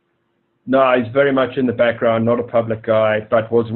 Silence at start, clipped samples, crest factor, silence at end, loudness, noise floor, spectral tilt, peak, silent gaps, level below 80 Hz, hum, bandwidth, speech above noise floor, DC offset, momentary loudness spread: 0.65 s; under 0.1%; 16 dB; 0 s; -16 LUFS; -66 dBFS; -11 dB/octave; 0 dBFS; none; -54 dBFS; none; 4.2 kHz; 50 dB; under 0.1%; 4 LU